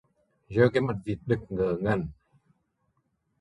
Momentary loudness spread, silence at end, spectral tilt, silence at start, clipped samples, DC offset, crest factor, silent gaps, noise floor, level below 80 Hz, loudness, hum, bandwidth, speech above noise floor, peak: 9 LU; 1.3 s; -8.5 dB/octave; 0.5 s; under 0.1%; under 0.1%; 22 dB; none; -74 dBFS; -52 dBFS; -27 LUFS; none; 10.5 kHz; 48 dB; -8 dBFS